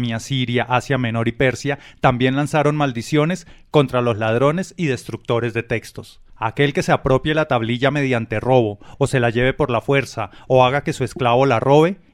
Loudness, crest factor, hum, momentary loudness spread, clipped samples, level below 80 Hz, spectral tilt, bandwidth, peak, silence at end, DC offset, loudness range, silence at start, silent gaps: -19 LUFS; 16 dB; none; 9 LU; under 0.1%; -42 dBFS; -6 dB/octave; 13.5 kHz; -2 dBFS; 0.2 s; under 0.1%; 3 LU; 0 s; none